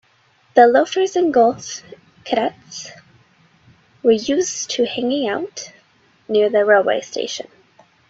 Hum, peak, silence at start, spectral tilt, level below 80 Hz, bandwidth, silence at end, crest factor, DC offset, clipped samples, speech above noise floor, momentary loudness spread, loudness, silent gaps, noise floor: none; 0 dBFS; 0.55 s; -3 dB/octave; -64 dBFS; 8 kHz; 0.65 s; 18 dB; under 0.1%; under 0.1%; 40 dB; 19 LU; -17 LUFS; none; -57 dBFS